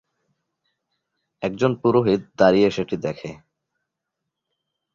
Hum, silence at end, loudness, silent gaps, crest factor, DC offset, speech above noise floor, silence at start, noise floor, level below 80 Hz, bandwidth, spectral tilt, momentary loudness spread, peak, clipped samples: none; 1.6 s; -20 LUFS; none; 20 dB; under 0.1%; 62 dB; 1.4 s; -82 dBFS; -58 dBFS; 7.4 kHz; -7 dB/octave; 13 LU; -2 dBFS; under 0.1%